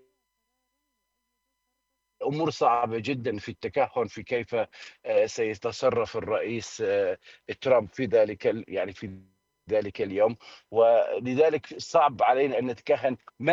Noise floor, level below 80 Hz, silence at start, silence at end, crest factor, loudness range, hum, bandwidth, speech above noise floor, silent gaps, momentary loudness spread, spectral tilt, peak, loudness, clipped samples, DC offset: -79 dBFS; -68 dBFS; 2.2 s; 0 s; 18 dB; 5 LU; none; 7.8 kHz; 53 dB; none; 10 LU; -5.5 dB/octave; -8 dBFS; -27 LUFS; under 0.1%; under 0.1%